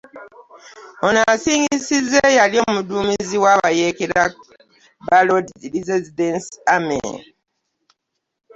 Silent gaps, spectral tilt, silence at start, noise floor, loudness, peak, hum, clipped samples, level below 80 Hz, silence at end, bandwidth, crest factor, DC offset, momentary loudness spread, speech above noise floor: none; -3.5 dB/octave; 0.15 s; -77 dBFS; -17 LUFS; -2 dBFS; none; under 0.1%; -54 dBFS; 1.35 s; 8.2 kHz; 18 dB; under 0.1%; 9 LU; 60 dB